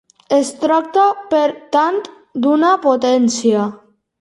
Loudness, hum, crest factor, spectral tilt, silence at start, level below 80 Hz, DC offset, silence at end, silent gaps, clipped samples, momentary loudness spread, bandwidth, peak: -15 LUFS; none; 14 dB; -4.5 dB/octave; 0.3 s; -66 dBFS; under 0.1%; 0.45 s; none; under 0.1%; 6 LU; 11.5 kHz; -2 dBFS